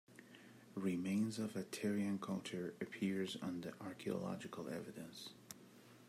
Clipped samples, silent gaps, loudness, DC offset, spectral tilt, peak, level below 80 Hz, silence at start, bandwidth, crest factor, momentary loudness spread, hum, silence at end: under 0.1%; none; -44 LUFS; under 0.1%; -5.5 dB/octave; -26 dBFS; -86 dBFS; 0.1 s; 15.5 kHz; 18 dB; 17 LU; none; 0 s